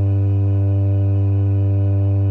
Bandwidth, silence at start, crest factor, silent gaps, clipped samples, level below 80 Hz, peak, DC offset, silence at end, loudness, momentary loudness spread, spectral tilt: 2.8 kHz; 0 s; 4 dB; none; under 0.1%; -48 dBFS; -12 dBFS; under 0.1%; 0 s; -18 LUFS; 0 LU; -12.5 dB/octave